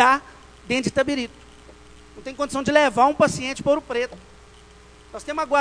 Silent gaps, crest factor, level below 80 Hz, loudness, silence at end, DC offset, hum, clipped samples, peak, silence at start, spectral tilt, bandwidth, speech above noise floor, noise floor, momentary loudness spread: none; 22 dB; -50 dBFS; -22 LUFS; 0 s; under 0.1%; none; under 0.1%; 0 dBFS; 0 s; -4 dB/octave; 11 kHz; 26 dB; -48 dBFS; 17 LU